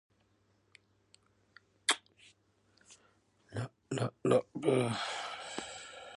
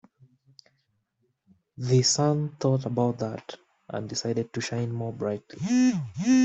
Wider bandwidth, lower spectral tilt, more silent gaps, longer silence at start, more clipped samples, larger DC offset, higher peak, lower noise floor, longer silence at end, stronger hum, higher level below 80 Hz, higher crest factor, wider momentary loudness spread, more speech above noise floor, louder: first, 11.5 kHz vs 8.2 kHz; second, -4 dB/octave vs -5.5 dB/octave; neither; about the same, 1.9 s vs 1.8 s; neither; neither; about the same, -12 dBFS vs -10 dBFS; about the same, -73 dBFS vs -74 dBFS; about the same, 0.05 s vs 0 s; neither; second, -74 dBFS vs -66 dBFS; first, 26 dB vs 16 dB; about the same, 12 LU vs 14 LU; second, 41 dB vs 49 dB; second, -35 LUFS vs -27 LUFS